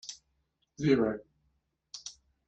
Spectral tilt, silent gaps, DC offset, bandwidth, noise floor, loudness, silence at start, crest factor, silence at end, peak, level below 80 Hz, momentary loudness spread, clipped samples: -5.5 dB/octave; none; under 0.1%; 8.4 kHz; -77 dBFS; -30 LUFS; 0.05 s; 22 dB; 0.35 s; -14 dBFS; -64 dBFS; 21 LU; under 0.1%